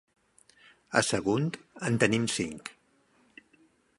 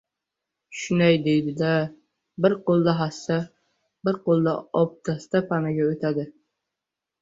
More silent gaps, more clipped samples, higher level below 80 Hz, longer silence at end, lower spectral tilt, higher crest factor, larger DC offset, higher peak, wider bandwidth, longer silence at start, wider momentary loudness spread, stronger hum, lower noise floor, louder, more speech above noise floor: neither; neither; about the same, -64 dBFS vs -62 dBFS; first, 1.25 s vs 0.9 s; second, -4.5 dB/octave vs -7 dB/octave; first, 26 dB vs 18 dB; neither; about the same, -6 dBFS vs -6 dBFS; first, 11.5 kHz vs 7.8 kHz; first, 0.9 s vs 0.7 s; about the same, 11 LU vs 12 LU; neither; second, -67 dBFS vs -86 dBFS; second, -29 LUFS vs -24 LUFS; second, 38 dB vs 63 dB